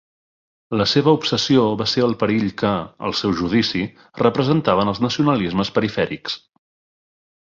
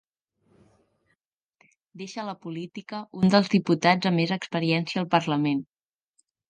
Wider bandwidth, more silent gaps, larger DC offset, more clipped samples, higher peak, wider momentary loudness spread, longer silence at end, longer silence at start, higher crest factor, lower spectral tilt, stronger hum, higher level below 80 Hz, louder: second, 7.6 kHz vs 9 kHz; neither; neither; neither; about the same, -2 dBFS vs -4 dBFS; second, 8 LU vs 15 LU; first, 1.15 s vs 0.85 s; second, 0.7 s vs 1.95 s; about the same, 18 dB vs 22 dB; about the same, -6 dB/octave vs -6 dB/octave; neither; first, -50 dBFS vs -68 dBFS; first, -19 LUFS vs -25 LUFS